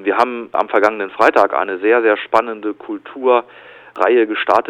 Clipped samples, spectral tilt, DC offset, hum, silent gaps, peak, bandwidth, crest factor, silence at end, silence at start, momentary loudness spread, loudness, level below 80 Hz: 0.2%; -4.5 dB/octave; under 0.1%; none; none; 0 dBFS; 11 kHz; 16 dB; 0 s; 0 s; 11 LU; -16 LUFS; -64 dBFS